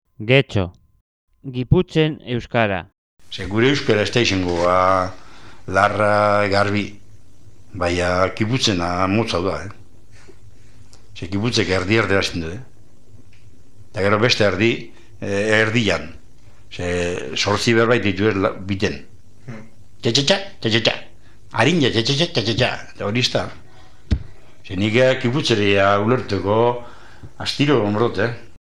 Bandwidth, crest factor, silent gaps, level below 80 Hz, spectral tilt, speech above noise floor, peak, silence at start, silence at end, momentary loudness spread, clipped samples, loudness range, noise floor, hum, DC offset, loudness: 12 kHz; 20 dB; 1.01-1.28 s, 2.98-3.17 s; -42 dBFS; -5 dB/octave; 31 dB; 0 dBFS; 0 s; 0.2 s; 14 LU; under 0.1%; 4 LU; -49 dBFS; none; 2%; -19 LUFS